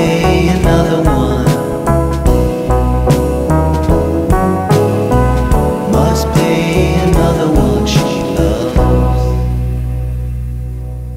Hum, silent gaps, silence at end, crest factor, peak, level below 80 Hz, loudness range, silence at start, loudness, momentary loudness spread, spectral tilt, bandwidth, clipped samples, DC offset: none; none; 0 s; 12 dB; 0 dBFS; -18 dBFS; 2 LU; 0 s; -13 LUFS; 7 LU; -7 dB/octave; 16 kHz; under 0.1%; under 0.1%